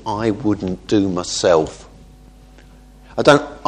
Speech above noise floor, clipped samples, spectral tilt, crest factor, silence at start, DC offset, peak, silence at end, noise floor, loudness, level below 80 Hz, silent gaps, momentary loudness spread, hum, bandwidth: 27 dB; under 0.1%; -5 dB/octave; 18 dB; 0 s; under 0.1%; 0 dBFS; 0.1 s; -43 dBFS; -17 LUFS; -44 dBFS; none; 9 LU; none; 10.5 kHz